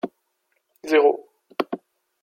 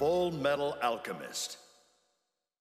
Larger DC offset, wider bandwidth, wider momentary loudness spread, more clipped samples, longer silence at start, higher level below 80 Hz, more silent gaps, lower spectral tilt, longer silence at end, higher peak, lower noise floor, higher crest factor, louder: neither; about the same, 14 kHz vs 15 kHz; first, 17 LU vs 9 LU; neither; about the same, 0.05 s vs 0 s; second, -78 dBFS vs -66 dBFS; neither; about the same, -4.5 dB/octave vs -4 dB/octave; second, 0.45 s vs 1 s; first, -4 dBFS vs -16 dBFS; second, -72 dBFS vs -82 dBFS; about the same, 20 dB vs 18 dB; first, -22 LUFS vs -33 LUFS